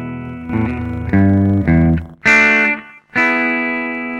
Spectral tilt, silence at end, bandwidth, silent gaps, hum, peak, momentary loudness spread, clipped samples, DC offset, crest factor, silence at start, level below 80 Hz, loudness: -7 dB/octave; 0 s; 10 kHz; none; none; -2 dBFS; 13 LU; under 0.1%; under 0.1%; 14 dB; 0 s; -32 dBFS; -14 LUFS